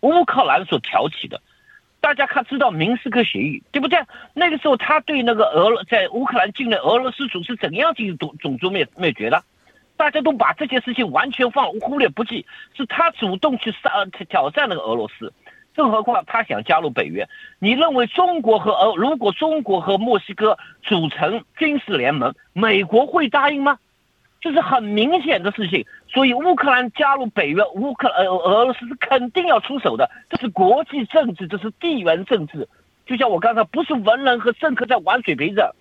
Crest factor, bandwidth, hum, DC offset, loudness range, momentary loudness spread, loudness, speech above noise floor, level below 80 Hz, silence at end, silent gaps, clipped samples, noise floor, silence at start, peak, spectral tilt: 16 dB; 7.8 kHz; none; under 0.1%; 3 LU; 9 LU; -19 LUFS; 43 dB; -64 dBFS; 0.1 s; none; under 0.1%; -62 dBFS; 0.05 s; -4 dBFS; -7 dB/octave